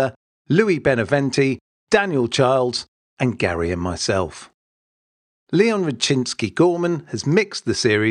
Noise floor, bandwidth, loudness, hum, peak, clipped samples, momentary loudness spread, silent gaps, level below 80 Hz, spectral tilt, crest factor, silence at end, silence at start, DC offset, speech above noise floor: under -90 dBFS; 11 kHz; -20 LUFS; none; -2 dBFS; under 0.1%; 7 LU; 0.16-0.45 s, 1.61-1.87 s, 2.88-3.17 s, 4.54-5.47 s; -50 dBFS; -5 dB/octave; 18 dB; 0 s; 0 s; under 0.1%; over 71 dB